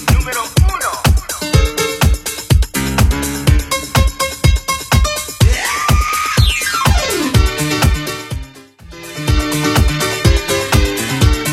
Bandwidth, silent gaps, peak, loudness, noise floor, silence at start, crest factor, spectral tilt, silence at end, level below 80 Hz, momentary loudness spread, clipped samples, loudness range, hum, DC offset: 16.5 kHz; none; 0 dBFS; -15 LUFS; -37 dBFS; 0 s; 14 dB; -4 dB/octave; 0 s; -18 dBFS; 4 LU; under 0.1%; 2 LU; none; under 0.1%